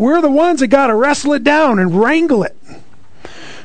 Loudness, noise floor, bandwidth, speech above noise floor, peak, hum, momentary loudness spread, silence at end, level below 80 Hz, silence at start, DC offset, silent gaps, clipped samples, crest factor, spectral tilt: -12 LUFS; -44 dBFS; 9.4 kHz; 32 dB; 0 dBFS; none; 4 LU; 0.05 s; -48 dBFS; 0 s; 3%; none; under 0.1%; 14 dB; -5.5 dB/octave